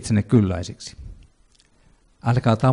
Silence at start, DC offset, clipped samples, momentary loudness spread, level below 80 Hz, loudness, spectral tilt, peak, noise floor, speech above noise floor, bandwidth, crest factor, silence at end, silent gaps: 0 s; under 0.1%; under 0.1%; 19 LU; -46 dBFS; -21 LUFS; -7 dB/octave; -6 dBFS; -58 dBFS; 38 dB; 10.5 kHz; 16 dB; 0 s; none